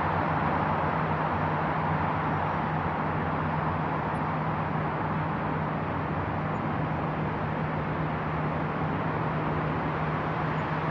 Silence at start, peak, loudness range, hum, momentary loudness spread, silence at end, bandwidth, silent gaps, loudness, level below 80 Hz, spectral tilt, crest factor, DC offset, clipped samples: 0 s; -14 dBFS; 2 LU; none; 3 LU; 0 s; 6 kHz; none; -29 LUFS; -50 dBFS; -9 dB/octave; 14 dB; under 0.1%; under 0.1%